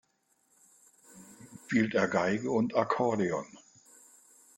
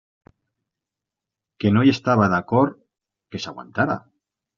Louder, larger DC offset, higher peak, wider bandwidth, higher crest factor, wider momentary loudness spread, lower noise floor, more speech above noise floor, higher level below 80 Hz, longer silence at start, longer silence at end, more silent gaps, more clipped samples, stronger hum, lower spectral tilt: second, -30 LUFS vs -20 LUFS; neither; second, -12 dBFS vs -4 dBFS; first, 12.5 kHz vs 7.2 kHz; about the same, 20 dB vs 20 dB; first, 23 LU vs 15 LU; second, -73 dBFS vs -86 dBFS; second, 44 dB vs 67 dB; second, -72 dBFS vs -60 dBFS; second, 1.15 s vs 1.6 s; first, 1 s vs 0.6 s; neither; neither; neither; about the same, -6 dB/octave vs -6 dB/octave